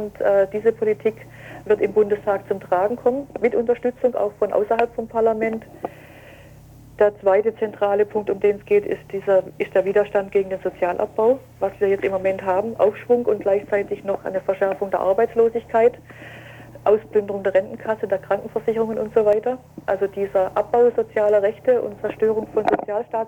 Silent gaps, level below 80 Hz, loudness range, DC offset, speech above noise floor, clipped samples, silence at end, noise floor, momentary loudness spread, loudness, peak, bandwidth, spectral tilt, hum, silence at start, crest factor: none; -56 dBFS; 2 LU; under 0.1%; 24 dB; under 0.1%; 0 s; -44 dBFS; 8 LU; -21 LUFS; -4 dBFS; 17 kHz; -7.5 dB/octave; none; 0 s; 16 dB